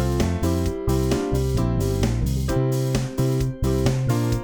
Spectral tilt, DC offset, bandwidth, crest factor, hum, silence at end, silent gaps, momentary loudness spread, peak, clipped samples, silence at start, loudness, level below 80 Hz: -6.5 dB/octave; 0.1%; over 20 kHz; 14 dB; none; 0 s; none; 2 LU; -8 dBFS; under 0.1%; 0 s; -23 LUFS; -30 dBFS